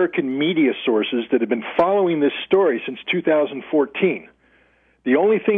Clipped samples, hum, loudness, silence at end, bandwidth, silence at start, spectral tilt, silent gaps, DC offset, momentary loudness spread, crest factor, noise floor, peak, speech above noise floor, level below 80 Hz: under 0.1%; none; -20 LUFS; 0 s; 4.2 kHz; 0 s; -8.5 dB/octave; none; under 0.1%; 4 LU; 14 dB; -58 dBFS; -4 dBFS; 39 dB; -64 dBFS